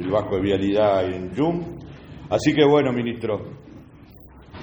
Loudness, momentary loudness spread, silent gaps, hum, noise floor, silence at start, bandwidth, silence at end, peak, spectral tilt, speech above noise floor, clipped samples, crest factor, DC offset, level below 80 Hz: -21 LUFS; 22 LU; none; none; -46 dBFS; 0 s; over 20 kHz; 0 s; -4 dBFS; -6.5 dB/octave; 25 dB; under 0.1%; 18 dB; under 0.1%; -48 dBFS